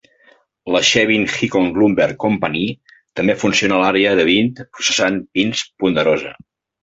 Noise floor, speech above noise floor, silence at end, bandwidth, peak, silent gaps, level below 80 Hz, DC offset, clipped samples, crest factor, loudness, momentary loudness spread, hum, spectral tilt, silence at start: -53 dBFS; 37 dB; 0.5 s; 8.2 kHz; 0 dBFS; none; -50 dBFS; under 0.1%; under 0.1%; 18 dB; -16 LUFS; 8 LU; none; -3.5 dB/octave; 0.65 s